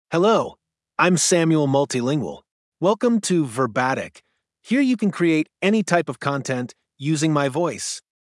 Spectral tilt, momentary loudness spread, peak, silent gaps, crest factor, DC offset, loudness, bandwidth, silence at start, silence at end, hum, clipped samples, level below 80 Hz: -5 dB/octave; 11 LU; -2 dBFS; 2.51-2.72 s; 18 dB; under 0.1%; -21 LUFS; 12 kHz; 0.1 s; 0.3 s; none; under 0.1%; -70 dBFS